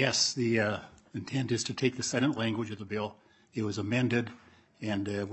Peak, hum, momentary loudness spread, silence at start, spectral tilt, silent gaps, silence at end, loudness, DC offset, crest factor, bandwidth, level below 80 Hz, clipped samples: -10 dBFS; none; 13 LU; 0 s; -4 dB/octave; none; 0 s; -31 LUFS; under 0.1%; 22 dB; 8.6 kHz; -70 dBFS; under 0.1%